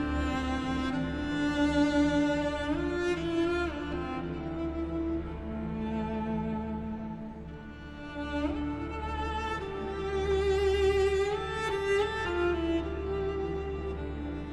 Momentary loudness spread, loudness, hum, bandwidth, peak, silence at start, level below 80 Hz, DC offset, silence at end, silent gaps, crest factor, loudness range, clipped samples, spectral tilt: 11 LU; -31 LUFS; none; 11.5 kHz; -14 dBFS; 0 s; -42 dBFS; under 0.1%; 0 s; none; 16 dB; 7 LU; under 0.1%; -6.5 dB/octave